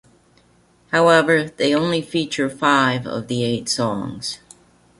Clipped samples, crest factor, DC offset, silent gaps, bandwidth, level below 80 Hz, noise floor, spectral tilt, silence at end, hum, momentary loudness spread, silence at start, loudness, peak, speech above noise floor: under 0.1%; 18 dB; under 0.1%; none; 11.5 kHz; -58 dBFS; -56 dBFS; -4.5 dB/octave; 0.65 s; none; 12 LU; 0.9 s; -19 LUFS; -2 dBFS; 37 dB